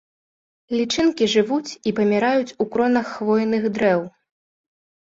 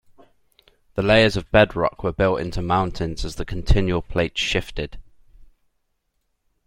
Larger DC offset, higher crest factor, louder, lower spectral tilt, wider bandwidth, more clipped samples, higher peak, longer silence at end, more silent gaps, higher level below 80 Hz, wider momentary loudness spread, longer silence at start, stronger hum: neither; second, 16 dB vs 22 dB; about the same, -20 LUFS vs -21 LUFS; about the same, -5 dB/octave vs -5.5 dB/octave; second, 7.8 kHz vs 15.5 kHz; neither; second, -6 dBFS vs -2 dBFS; second, 0.95 s vs 1.2 s; neither; second, -60 dBFS vs -32 dBFS; second, 6 LU vs 14 LU; second, 0.7 s vs 0.95 s; neither